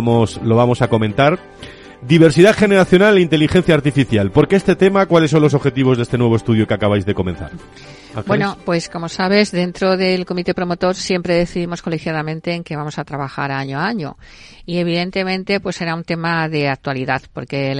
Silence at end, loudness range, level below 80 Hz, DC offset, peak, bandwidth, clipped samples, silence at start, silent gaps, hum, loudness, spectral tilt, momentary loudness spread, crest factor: 0 s; 9 LU; -42 dBFS; under 0.1%; 0 dBFS; 11.5 kHz; 0.1%; 0 s; none; none; -16 LUFS; -6.5 dB/octave; 13 LU; 16 dB